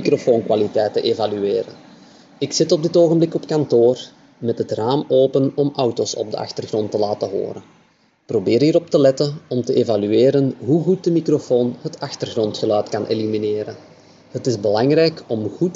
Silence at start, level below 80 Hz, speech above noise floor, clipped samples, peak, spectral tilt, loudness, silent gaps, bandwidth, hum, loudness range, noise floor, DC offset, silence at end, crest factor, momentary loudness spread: 0 s; -68 dBFS; 28 dB; under 0.1%; -2 dBFS; -6 dB/octave; -19 LUFS; none; 7.8 kHz; none; 4 LU; -46 dBFS; under 0.1%; 0 s; 16 dB; 11 LU